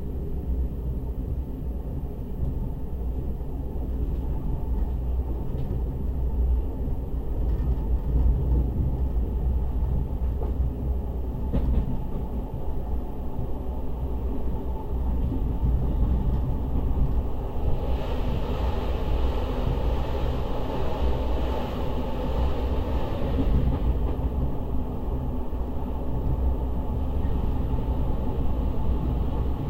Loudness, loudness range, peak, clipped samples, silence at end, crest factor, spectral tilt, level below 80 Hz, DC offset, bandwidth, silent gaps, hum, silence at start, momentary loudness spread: -29 LUFS; 4 LU; -10 dBFS; under 0.1%; 0 s; 14 dB; -9 dB/octave; -26 dBFS; 0.3%; 4.9 kHz; none; none; 0 s; 6 LU